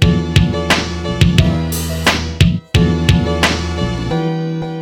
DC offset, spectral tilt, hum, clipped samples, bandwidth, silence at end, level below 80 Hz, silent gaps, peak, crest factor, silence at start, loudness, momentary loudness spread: 0.2%; -5.5 dB/octave; none; under 0.1%; 18 kHz; 0 s; -24 dBFS; none; 0 dBFS; 14 dB; 0 s; -15 LUFS; 7 LU